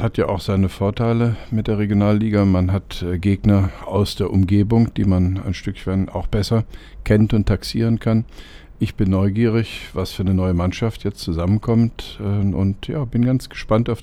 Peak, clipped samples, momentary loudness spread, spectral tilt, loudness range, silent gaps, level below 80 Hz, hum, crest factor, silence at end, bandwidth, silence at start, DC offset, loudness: -2 dBFS; under 0.1%; 8 LU; -8 dB/octave; 3 LU; none; -34 dBFS; none; 16 dB; 0 s; 13.5 kHz; 0 s; under 0.1%; -20 LUFS